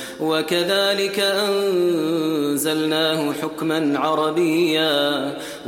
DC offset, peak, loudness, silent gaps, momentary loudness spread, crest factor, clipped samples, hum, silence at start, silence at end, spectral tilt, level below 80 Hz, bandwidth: under 0.1%; -6 dBFS; -20 LUFS; none; 5 LU; 14 dB; under 0.1%; none; 0 s; 0 s; -4 dB/octave; -64 dBFS; 16.5 kHz